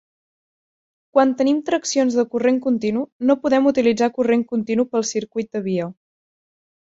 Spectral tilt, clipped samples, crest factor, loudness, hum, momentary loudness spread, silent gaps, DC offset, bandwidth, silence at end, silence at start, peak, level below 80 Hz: -5 dB/octave; under 0.1%; 18 dB; -20 LUFS; none; 8 LU; 3.12-3.20 s; under 0.1%; 8 kHz; 0.95 s; 1.15 s; -2 dBFS; -64 dBFS